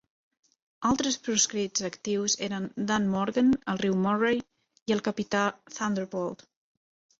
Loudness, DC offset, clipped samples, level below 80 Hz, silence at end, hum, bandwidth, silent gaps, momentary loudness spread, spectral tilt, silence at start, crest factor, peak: -28 LUFS; under 0.1%; under 0.1%; -64 dBFS; 0.85 s; none; 8 kHz; 4.82-4.86 s; 8 LU; -3.5 dB/octave; 0.8 s; 18 dB; -12 dBFS